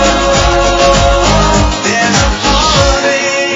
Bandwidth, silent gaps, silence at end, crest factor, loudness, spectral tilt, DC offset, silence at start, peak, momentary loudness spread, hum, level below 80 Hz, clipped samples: 7.8 kHz; none; 0 s; 10 dB; -9 LUFS; -3.5 dB/octave; under 0.1%; 0 s; 0 dBFS; 3 LU; none; -18 dBFS; 0.2%